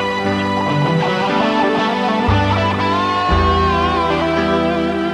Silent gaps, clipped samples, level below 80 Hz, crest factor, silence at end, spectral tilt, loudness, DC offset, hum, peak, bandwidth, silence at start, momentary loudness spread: none; under 0.1%; -30 dBFS; 14 dB; 0 s; -6.5 dB/octave; -16 LUFS; under 0.1%; none; -2 dBFS; 11.5 kHz; 0 s; 3 LU